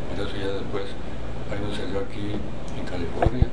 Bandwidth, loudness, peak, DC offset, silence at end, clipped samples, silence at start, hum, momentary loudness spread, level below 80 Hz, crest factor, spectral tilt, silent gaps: 10 kHz; -30 LUFS; -4 dBFS; 6%; 0 s; under 0.1%; 0 s; none; 9 LU; -34 dBFS; 22 dB; -7 dB/octave; none